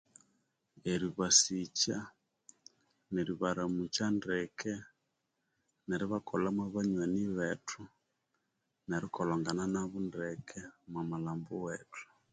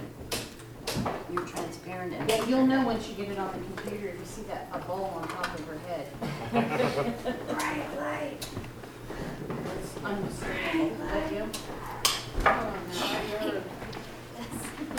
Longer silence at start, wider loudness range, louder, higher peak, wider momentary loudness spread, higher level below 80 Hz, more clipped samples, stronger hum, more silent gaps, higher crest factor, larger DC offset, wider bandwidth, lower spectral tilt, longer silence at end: first, 0.85 s vs 0 s; about the same, 6 LU vs 5 LU; second, -35 LUFS vs -32 LUFS; second, -12 dBFS vs -8 dBFS; about the same, 12 LU vs 12 LU; second, -66 dBFS vs -48 dBFS; neither; neither; neither; about the same, 26 dB vs 24 dB; neither; second, 9.6 kHz vs over 20 kHz; about the same, -3.5 dB/octave vs -4.5 dB/octave; first, 0.3 s vs 0 s